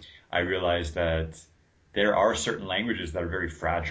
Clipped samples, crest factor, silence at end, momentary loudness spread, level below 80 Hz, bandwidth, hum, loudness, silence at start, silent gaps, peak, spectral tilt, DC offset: under 0.1%; 18 dB; 0 s; 8 LU; -42 dBFS; 8 kHz; none; -28 LUFS; 0 s; none; -10 dBFS; -4.5 dB/octave; under 0.1%